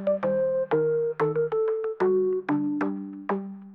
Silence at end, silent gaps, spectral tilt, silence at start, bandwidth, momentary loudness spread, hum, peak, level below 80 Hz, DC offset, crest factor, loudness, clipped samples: 0 s; none; -10 dB/octave; 0 s; 5.6 kHz; 7 LU; none; -14 dBFS; -74 dBFS; under 0.1%; 12 dB; -26 LUFS; under 0.1%